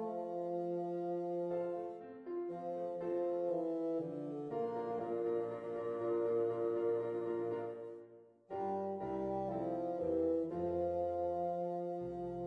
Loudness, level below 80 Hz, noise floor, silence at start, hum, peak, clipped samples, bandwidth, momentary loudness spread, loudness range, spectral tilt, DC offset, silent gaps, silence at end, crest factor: -39 LUFS; -70 dBFS; -59 dBFS; 0 s; none; -24 dBFS; under 0.1%; 5 kHz; 7 LU; 2 LU; -9.5 dB/octave; under 0.1%; none; 0 s; 14 dB